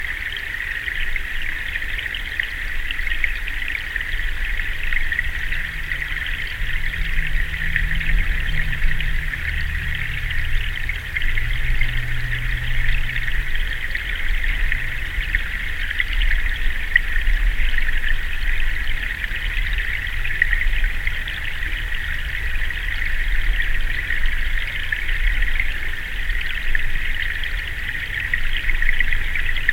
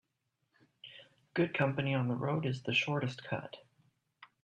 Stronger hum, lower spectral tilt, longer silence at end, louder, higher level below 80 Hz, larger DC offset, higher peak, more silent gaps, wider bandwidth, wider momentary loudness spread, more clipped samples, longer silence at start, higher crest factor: neither; second, -3.5 dB/octave vs -6.5 dB/octave; second, 0 s vs 0.2 s; first, -23 LUFS vs -34 LUFS; first, -22 dBFS vs -74 dBFS; neither; first, 0 dBFS vs -16 dBFS; neither; first, 16 kHz vs 8.6 kHz; second, 4 LU vs 21 LU; neither; second, 0 s vs 0.85 s; about the same, 20 dB vs 20 dB